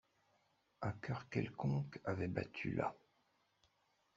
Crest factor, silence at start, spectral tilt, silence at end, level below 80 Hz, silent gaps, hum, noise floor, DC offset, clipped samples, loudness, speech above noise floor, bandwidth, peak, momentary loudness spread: 22 dB; 0.8 s; -7 dB/octave; 1.2 s; -72 dBFS; none; none; -79 dBFS; under 0.1%; under 0.1%; -43 LUFS; 38 dB; 7.6 kHz; -22 dBFS; 5 LU